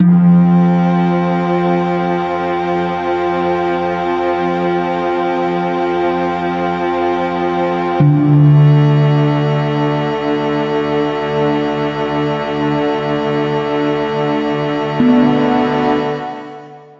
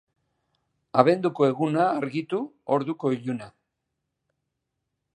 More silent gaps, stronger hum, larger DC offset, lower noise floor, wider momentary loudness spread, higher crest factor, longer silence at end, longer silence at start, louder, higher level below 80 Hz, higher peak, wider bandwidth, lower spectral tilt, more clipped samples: neither; neither; neither; second, -34 dBFS vs -81 dBFS; second, 7 LU vs 10 LU; second, 12 dB vs 24 dB; second, 0.15 s vs 1.7 s; second, 0 s vs 0.95 s; first, -15 LUFS vs -25 LUFS; first, -50 dBFS vs -74 dBFS; about the same, -2 dBFS vs -2 dBFS; second, 7.2 kHz vs 10.5 kHz; about the same, -9 dB/octave vs -8 dB/octave; neither